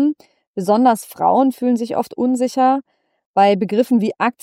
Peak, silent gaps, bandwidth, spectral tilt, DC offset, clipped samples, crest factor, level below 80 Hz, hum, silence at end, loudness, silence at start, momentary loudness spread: -4 dBFS; 0.47-0.54 s, 3.26-3.34 s; 16 kHz; -6 dB/octave; under 0.1%; under 0.1%; 14 dB; -70 dBFS; none; 0.1 s; -17 LUFS; 0 s; 8 LU